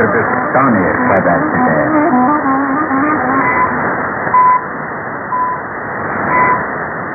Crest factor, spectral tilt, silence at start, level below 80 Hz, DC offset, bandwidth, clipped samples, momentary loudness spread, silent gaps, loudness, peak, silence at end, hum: 14 dB; -13 dB/octave; 0 s; -44 dBFS; under 0.1%; 2.6 kHz; under 0.1%; 9 LU; none; -13 LUFS; 0 dBFS; 0 s; none